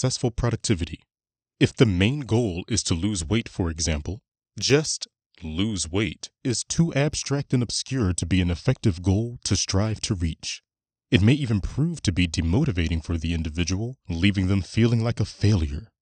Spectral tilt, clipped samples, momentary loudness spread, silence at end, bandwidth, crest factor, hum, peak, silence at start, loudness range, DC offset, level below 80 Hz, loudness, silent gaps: -5 dB/octave; under 0.1%; 9 LU; 0.15 s; 9.6 kHz; 22 dB; none; -2 dBFS; 0 s; 2 LU; under 0.1%; -38 dBFS; -24 LUFS; 5.26-5.30 s